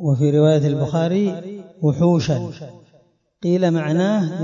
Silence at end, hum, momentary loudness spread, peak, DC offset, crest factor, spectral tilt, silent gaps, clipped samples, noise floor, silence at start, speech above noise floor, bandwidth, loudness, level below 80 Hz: 0 s; none; 16 LU; -4 dBFS; under 0.1%; 14 dB; -8 dB/octave; none; under 0.1%; -57 dBFS; 0 s; 39 dB; 7.4 kHz; -19 LUFS; -56 dBFS